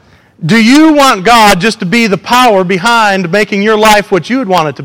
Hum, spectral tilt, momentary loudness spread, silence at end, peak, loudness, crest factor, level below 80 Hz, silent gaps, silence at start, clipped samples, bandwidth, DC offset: none; -4.5 dB/octave; 6 LU; 0 s; 0 dBFS; -7 LUFS; 8 dB; -38 dBFS; none; 0.4 s; 1%; over 20 kHz; 1%